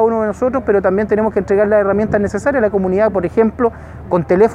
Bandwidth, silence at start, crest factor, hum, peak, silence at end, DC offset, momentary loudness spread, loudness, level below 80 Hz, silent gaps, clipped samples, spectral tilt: 10 kHz; 0 s; 14 dB; none; 0 dBFS; 0 s; under 0.1%; 6 LU; -15 LUFS; -38 dBFS; none; under 0.1%; -8.5 dB/octave